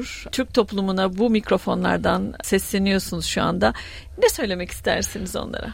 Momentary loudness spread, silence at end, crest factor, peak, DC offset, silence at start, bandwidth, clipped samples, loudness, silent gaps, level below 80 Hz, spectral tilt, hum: 8 LU; 0 s; 18 dB; -4 dBFS; under 0.1%; 0 s; 16.5 kHz; under 0.1%; -22 LUFS; none; -40 dBFS; -4.5 dB/octave; none